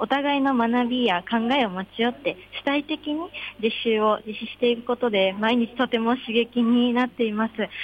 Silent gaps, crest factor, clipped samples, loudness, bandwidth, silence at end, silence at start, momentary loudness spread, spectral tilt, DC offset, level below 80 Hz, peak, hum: none; 14 dB; under 0.1%; -23 LUFS; 5.2 kHz; 0 s; 0 s; 7 LU; -6.5 dB/octave; under 0.1%; -60 dBFS; -10 dBFS; none